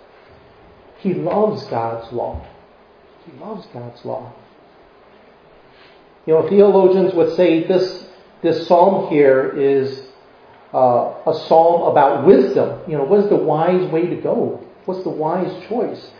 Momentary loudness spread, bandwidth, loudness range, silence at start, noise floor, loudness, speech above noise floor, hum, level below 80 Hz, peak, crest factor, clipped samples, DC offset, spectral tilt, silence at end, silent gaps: 18 LU; 5.4 kHz; 17 LU; 1.05 s; -48 dBFS; -16 LUFS; 32 dB; none; -52 dBFS; 0 dBFS; 18 dB; under 0.1%; under 0.1%; -8.5 dB/octave; 0.15 s; none